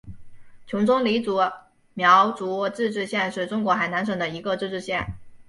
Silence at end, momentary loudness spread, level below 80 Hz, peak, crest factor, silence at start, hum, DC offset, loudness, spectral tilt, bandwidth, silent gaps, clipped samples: 0.05 s; 11 LU; -54 dBFS; -4 dBFS; 20 dB; 0.05 s; none; under 0.1%; -23 LUFS; -5.5 dB/octave; 11.5 kHz; none; under 0.1%